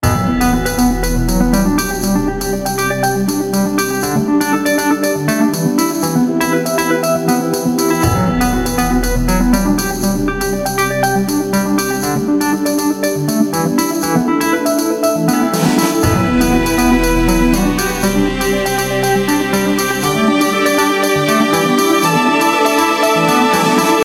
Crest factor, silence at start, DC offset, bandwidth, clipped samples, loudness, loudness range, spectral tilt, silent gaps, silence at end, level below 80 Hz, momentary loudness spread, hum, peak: 14 dB; 0 s; under 0.1%; 16.5 kHz; under 0.1%; -14 LUFS; 3 LU; -4.5 dB/octave; none; 0 s; -26 dBFS; 4 LU; none; 0 dBFS